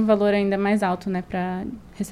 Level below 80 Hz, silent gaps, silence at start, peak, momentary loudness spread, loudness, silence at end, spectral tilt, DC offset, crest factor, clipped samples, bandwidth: -50 dBFS; none; 0 s; -6 dBFS; 13 LU; -23 LUFS; 0 s; -7 dB/octave; under 0.1%; 16 dB; under 0.1%; 13.5 kHz